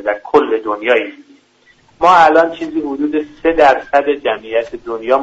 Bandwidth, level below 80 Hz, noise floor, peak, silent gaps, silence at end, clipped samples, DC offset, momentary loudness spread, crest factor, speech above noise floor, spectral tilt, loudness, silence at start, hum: 8 kHz; -46 dBFS; -51 dBFS; 0 dBFS; none; 0 s; under 0.1%; under 0.1%; 11 LU; 14 dB; 38 dB; -5 dB/octave; -14 LUFS; 0 s; none